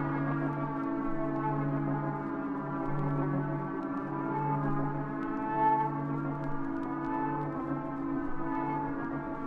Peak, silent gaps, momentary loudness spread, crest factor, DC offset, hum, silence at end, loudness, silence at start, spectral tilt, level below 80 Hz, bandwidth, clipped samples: -18 dBFS; none; 5 LU; 14 dB; under 0.1%; none; 0 s; -33 LUFS; 0 s; -10.5 dB/octave; -50 dBFS; 4.7 kHz; under 0.1%